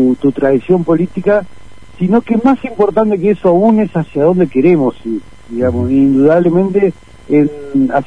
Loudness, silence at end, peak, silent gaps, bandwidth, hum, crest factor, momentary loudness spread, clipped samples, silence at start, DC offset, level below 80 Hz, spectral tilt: -12 LUFS; 0.05 s; 0 dBFS; none; 9.6 kHz; none; 12 dB; 7 LU; under 0.1%; 0 s; 2%; -42 dBFS; -9.5 dB/octave